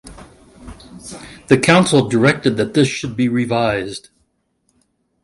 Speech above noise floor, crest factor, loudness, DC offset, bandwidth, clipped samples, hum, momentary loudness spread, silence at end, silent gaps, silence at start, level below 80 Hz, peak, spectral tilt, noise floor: 51 dB; 18 dB; -15 LUFS; under 0.1%; 11.5 kHz; under 0.1%; none; 22 LU; 1.25 s; none; 0.05 s; -48 dBFS; 0 dBFS; -5.5 dB/octave; -66 dBFS